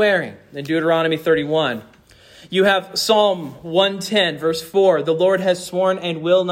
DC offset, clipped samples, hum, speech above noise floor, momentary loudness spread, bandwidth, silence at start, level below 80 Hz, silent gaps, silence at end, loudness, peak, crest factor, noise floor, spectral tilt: under 0.1%; under 0.1%; none; 29 dB; 7 LU; 16.5 kHz; 0 s; -60 dBFS; none; 0 s; -18 LUFS; -4 dBFS; 14 dB; -47 dBFS; -4.5 dB/octave